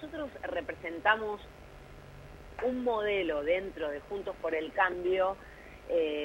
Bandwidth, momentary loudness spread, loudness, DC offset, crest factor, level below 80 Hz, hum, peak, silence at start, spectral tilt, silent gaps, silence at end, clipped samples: 16.5 kHz; 22 LU; -32 LUFS; under 0.1%; 20 dB; -56 dBFS; none; -12 dBFS; 0 s; -5.5 dB/octave; none; 0 s; under 0.1%